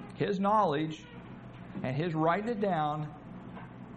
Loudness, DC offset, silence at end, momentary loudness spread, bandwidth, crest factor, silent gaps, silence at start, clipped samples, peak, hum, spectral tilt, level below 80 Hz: -31 LUFS; under 0.1%; 0 s; 19 LU; 9 kHz; 18 dB; none; 0 s; under 0.1%; -14 dBFS; none; -7.5 dB/octave; -62 dBFS